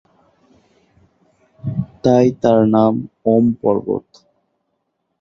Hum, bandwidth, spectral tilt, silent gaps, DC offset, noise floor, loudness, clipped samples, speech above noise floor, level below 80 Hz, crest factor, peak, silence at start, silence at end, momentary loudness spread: none; 6.8 kHz; -8.5 dB/octave; none; under 0.1%; -71 dBFS; -16 LUFS; under 0.1%; 56 dB; -52 dBFS; 18 dB; 0 dBFS; 1.65 s; 1.2 s; 12 LU